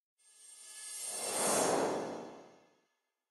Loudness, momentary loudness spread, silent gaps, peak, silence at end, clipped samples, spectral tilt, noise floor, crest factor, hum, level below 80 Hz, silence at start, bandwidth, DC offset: -34 LUFS; 22 LU; none; -18 dBFS; 0.8 s; under 0.1%; -2 dB/octave; -82 dBFS; 20 dB; none; -82 dBFS; 0.4 s; 14 kHz; under 0.1%